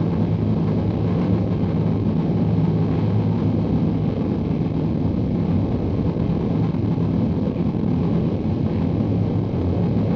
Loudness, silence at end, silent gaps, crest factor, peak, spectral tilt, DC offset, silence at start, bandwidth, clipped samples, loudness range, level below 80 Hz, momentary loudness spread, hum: -21 LUFS; 0 s; none; 12 dB; -8 dBFS; -10.5 dB/octave; under 0.1%; 0 s; 5.8 kHz; under 0.1%; 1 LU; -36 dBFS; 2 LU; none